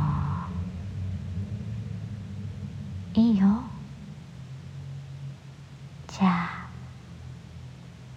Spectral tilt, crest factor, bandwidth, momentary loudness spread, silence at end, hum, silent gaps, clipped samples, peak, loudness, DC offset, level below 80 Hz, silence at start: -8 dB/octave; 18 dB; 8.4 kHz; 20 LU; 0 s; none; none; under 0.1%; -12 dBFS; -29 LUFS; under 0.1%; -48 dBFS; 0 s